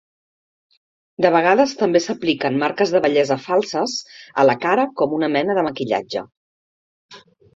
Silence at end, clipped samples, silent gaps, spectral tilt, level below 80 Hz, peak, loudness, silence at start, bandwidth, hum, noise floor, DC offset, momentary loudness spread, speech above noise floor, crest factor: 0.35 s; under 0.1%; 6.37-7.09 s; -5 dB/octave; -64 dBFS; -2 dBFS; -19 LUFS; 1.2 s; 7.8 kHz; none; under -90 dBFS; under 0.1%; 7 LU; over 72 dB; 18 dB